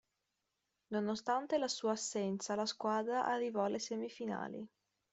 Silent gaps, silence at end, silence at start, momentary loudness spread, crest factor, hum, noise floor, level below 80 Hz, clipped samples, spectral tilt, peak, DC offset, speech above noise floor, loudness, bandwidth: none; 0.45 s; 0.9 s; 7 LU; 16 dB; none; -87 dBFS; -82 dBFS; under 0.1%; -4 dB/octave; -22 dBFS; under 0.1%; 49 dB; -38 LUFS; 8.2 kHz